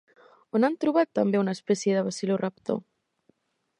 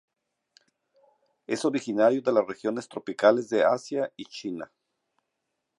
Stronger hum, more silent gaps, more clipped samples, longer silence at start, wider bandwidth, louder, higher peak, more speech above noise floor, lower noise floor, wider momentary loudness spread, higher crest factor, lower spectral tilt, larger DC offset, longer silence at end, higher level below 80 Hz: neither; neither; neither; second, 0.55 s vs 1.5 s; about the same, 10.5 kHz vs 11.5 kHz; about the same, -26 LUFS vs -26 LUFS; about the same, -10 dBFS vs -8 dBFS; second, 43 dB vs 56 dB; second, -68 dBFS vs -81 dBFS; second, 7 LU vs 14 LU; about the same, 18 dB vs 20 dB; about the same, -6 dB/octave vs -5 dB/octave; neither; second, 1 s vs 1.15 s; about the same, -76 dBFS vs -78 dBFS